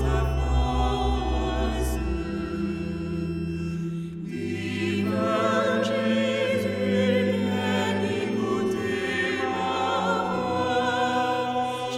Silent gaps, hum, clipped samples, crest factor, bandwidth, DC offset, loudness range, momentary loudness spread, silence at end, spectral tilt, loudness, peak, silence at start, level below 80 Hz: none; none; under 0.1%; 14 dB; 14.5 kHz; under 0.1%; 5 LU; 7 LU; 0 s; -6 dB/octave; -26 LUFS; -10 dBFS; 0 s; -34 dBFS